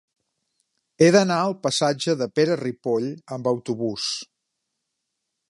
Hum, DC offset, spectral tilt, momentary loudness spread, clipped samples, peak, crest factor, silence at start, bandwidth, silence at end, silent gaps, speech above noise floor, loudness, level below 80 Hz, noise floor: none; under 0.1%; -4.5 dB/octave; 11 LU; under 0.1%; -4 dBFS; 20 dB; 1 s; 11.5 kHz; 1.25 s; none; 58 dB; -22 LUFS; -68 dBFS; -80 dBFS